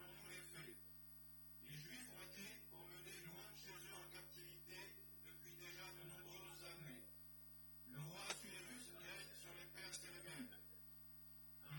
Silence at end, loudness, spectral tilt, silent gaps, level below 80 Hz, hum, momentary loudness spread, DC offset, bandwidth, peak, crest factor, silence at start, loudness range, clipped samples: 0 s; -55 LUFS; -3 dB/octave; none; -76 dBFS; 50 Hz at -70 dBFS; 6 LU; under 0.1%; 17.5 kHz; -32 dBFS; 26 dB; 0 s; 3 LU; under 0.1%